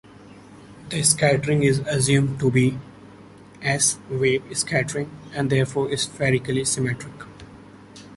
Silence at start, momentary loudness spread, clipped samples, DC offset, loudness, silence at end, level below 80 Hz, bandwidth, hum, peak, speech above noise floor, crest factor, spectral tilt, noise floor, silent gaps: 0.2 s; 12 LU; under 0.1%; under 0.1%; -22 LUFS; 0 s; -52 dBFS; 12 kHz; none; -2 dBFS; 24 dB; 20 dB; -4.5 dB/octave; -45 dBFS; none